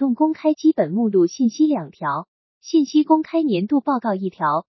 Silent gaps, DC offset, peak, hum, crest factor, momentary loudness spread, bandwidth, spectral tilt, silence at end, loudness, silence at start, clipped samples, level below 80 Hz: 2.28-2.61 s; under 0.1%; -4 dBFS; none; 14 dB; 7 LU; 6.2 kHz; -6.5 dB/octave; 0.1 s; -20 LUFS; 0 s; under 0.1%; -76 dBFS